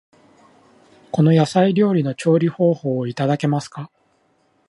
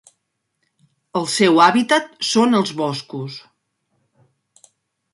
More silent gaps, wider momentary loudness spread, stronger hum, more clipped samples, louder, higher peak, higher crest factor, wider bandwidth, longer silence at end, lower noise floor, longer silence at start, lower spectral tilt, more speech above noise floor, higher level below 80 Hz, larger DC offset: neither; second, 11 LU vs 17 LU; neither; neither; about the same, -18 LUFS vs -17 LUFS; about the same, -4 dBFS vs -2 dBFS; about the same, 16 dB vs 20 dB; about the same, 11 kHz vs 11.5 kHz; second, 0.8 s vs 1.75 s; second, -62 dBFS vs -73 dBFS; about the same, 1.15 s vs 1.15 s; first, -7.5 dB/octave vs -4 dB/octave; second, 45 dB vs 56 dB; about the same, -64 dBFS vs -68 dBFS; neither